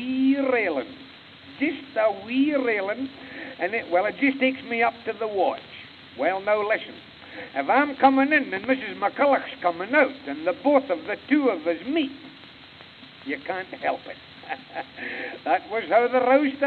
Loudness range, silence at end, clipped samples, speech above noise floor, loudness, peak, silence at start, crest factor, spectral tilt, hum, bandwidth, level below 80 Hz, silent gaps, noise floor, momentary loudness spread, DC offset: 8 LU; 0 s; under 0.1%; 23 dB; -24 LUFS; -4 dBFS; 0 s; 20 dB; -7 dB/octave; none; 4.7 kHz; -70 dBFS; none; -47 dBFS; 21 LU; under 0.1%